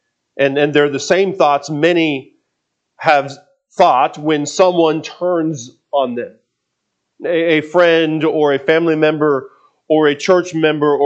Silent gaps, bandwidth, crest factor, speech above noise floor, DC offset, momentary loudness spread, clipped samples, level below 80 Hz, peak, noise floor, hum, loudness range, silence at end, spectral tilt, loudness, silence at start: none; 8.4 kHz; 16 dB; 59 dB; under 0.1%; 9 LU; under 0.1%; -66 dBFS; 0 dBFS; -73 dBFS; none; 3 LU; 0 s; -5 dB/octave; -15 LUFS; 0.35 s